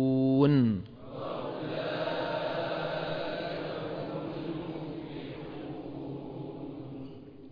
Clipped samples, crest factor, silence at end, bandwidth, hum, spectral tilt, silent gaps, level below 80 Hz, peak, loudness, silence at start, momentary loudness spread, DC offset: under 0.1%; 20 dB; 0 s; 5.2 kHz; none; -9.5 dB/octave; none; -62 dBFS; -12 dBFS; -33 LUFS; 0 s; 16 LU; under 0.1%